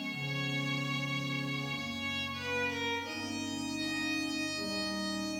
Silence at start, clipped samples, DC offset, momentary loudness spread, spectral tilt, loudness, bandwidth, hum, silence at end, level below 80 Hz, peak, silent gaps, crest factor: 0 s; under 0.1%; under 0.1%; 3 LU; -4 dB/octave; -34 LUFS; 16 kHz; none; 0 s; -66 dBFS; -24 dBFS; none; 12 dB